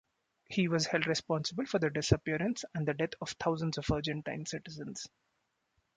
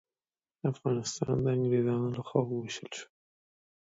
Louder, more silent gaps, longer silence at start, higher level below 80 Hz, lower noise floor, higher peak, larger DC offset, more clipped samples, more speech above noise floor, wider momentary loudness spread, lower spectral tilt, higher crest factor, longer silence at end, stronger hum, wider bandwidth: about the same, -34 LUFS vs -32 LUFS; neither; second, 0.5 s vs 0.65 s; first, -54 dBFS vs -64 dBFS; second, -80 dBFS vs under -90 dBFS; about the same, -12 dBFS vs -12 dBFS; neither; neither; second, 46 dB vs over 59 dB; about the same, 11 LU vs 11 LU; second, -5 dB/octave vs -6.5 dB/octave; about the same, 22 dB vs 22 dB; about the same, 0.9 s vs 0.95 s; neither; first, 9.4 kHz vs 8 kHz